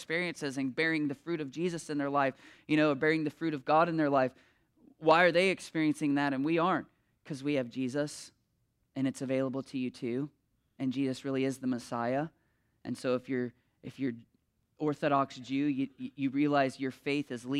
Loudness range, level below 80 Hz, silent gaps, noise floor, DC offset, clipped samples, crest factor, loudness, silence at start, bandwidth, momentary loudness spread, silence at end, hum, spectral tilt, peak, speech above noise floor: 7 LU; -78 dBFS; none; -76 dBFS; under 0.1%; under 0.1%; 22 dB; -32 LUFS; 0 s; 12.5 kHz; 11 LU; 0 s; none; -6 dB/octave; -10 dBFS; 45 dB